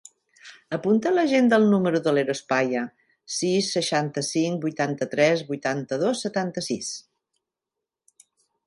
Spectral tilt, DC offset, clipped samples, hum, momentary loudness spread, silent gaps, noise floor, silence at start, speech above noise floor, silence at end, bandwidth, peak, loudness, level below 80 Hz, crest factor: -4.5 dB/octave; under 0.1%; under 0.1%; none; 10 LU; none; -87 dBFS; 0.45 s; 64 dB; 1.65 s; 11.5 kHz; -6 dBFS; -24 LUFS; -72 dBFS; 18 dB